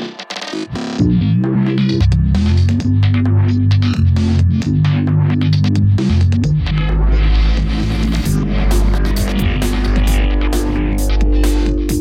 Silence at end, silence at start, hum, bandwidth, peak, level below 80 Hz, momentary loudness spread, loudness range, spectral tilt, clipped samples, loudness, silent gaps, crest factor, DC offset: 0 s; 0 s; none; 15.5 kHz; -2 dBFS; -18 dBFS; 4 LU; 3 LU; -7 dB/octave; under 0.1%; -15 LUFS; none; 12 dB; under 0.1%